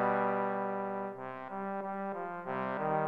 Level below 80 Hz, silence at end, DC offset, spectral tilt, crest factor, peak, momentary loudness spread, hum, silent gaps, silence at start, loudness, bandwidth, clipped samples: -82 dBFS; 0 s; under 0.1%; -9 dB/octave; 18 dB; -18 dBFS; 9 LU; none; none; 0 s; -36 LUFS; 5.4 kHz; under 0.1%